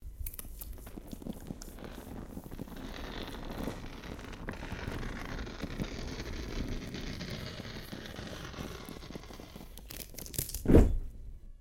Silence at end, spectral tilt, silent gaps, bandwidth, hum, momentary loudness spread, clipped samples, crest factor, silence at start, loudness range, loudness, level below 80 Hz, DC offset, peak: 0 s; -5.5 dB/octave; none; 17 kHz; none; 11 LU; under 0.1%; 26 dB; 0 s; 10 LU; -38 LUFS; -40 dBFS; under 0.1%; -10 dBFS